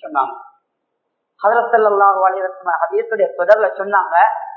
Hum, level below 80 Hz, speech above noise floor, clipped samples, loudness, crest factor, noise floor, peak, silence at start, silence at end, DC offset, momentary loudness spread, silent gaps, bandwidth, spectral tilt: none; -72 dBFS; 58 dB; under 0.1%; -15 LUFS; 16 dB; -73 dBFS; 0 dBFS; 0.05 s; 0 s; under 0.1%; 8 LU; none; 5.8 kHz; -6 dB/octave